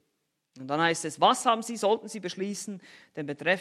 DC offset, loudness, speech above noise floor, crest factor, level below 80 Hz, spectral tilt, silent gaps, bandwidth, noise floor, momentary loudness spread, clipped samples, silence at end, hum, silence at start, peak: under 0.1%; -28 LUFS; 50 dB; 22 dB; -82 dBFS; -3.5 dB/octave; none; 14 kHz; -78 dBFS; 17 LU; under 0.1%; 0 s; none; 0.55 s; -6 dBFS